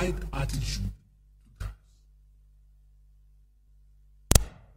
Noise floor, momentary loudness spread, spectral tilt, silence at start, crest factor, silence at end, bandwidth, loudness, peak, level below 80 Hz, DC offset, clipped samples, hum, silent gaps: -59 dBFS; 17 LU; -4 dB/octave; 0 s; 32 dB; 0.2 s; 16 kHz; -30 LUFS; 0 dBFS; -36 dBFS; under 0.1%; under 0.1%; 50 Hz at -50 dBFS; none